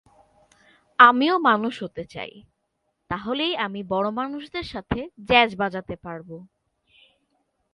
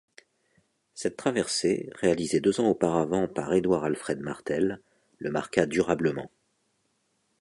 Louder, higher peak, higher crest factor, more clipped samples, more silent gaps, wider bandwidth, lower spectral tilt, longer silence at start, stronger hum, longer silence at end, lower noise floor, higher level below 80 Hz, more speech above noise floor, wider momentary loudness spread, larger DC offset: first, -21 LUFS vs -27 LUFS; first, 0 dBFS vs -6 dBFS; about the same, 24 dB vs 22 dB; neither; neither; about the same, 11 kHz vs 11.5 kHz; about the same, -6 dB/octave vs -5 dB/octave; about the same, 1 s vs 0.95 s; neither; first, 1.3 s vs 1.15 s; about the same, -75 dBFS vs -73 dBFS; first, -52 dBFS vs -60 dBFS; first, 52 dB vs 47 dB; first, 21 LU vs 9 LU; neither